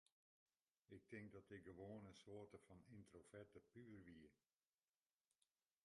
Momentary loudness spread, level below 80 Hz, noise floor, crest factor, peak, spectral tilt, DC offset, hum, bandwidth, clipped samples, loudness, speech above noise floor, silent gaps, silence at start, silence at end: 8 LU; -84 dBFS; under -90 dBFS; 20 dB; -44 dBFS; -6.5 dB/octave; under 0.1%; none; 11 kHz; under 0.1%; -63 LUFS; over 28 dB; none; 0.9 s; 1.5 s